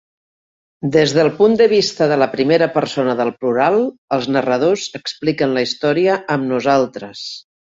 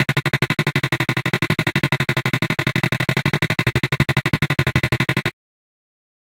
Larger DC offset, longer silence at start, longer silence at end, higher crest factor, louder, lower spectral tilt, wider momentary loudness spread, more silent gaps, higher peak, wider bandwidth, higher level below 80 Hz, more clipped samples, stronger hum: neither; first, 0.8 s vs 0 s; second, 0.35 s vs 1.05 s; about the same, 16 dB vs 20 dB; first, -16 LUFS vs -19 LUFS; about the same, -5 dB/octave vs -5.5 dB/octave; first, 10 LU vs 1 LU; first, 3.98-4.08 s vs none; about the same, -2 dBFS vs 0 dBFS; second, 7.8 kHz vs 17 kHz; second, -58 dBFS vs -42 dBFS; neither; neither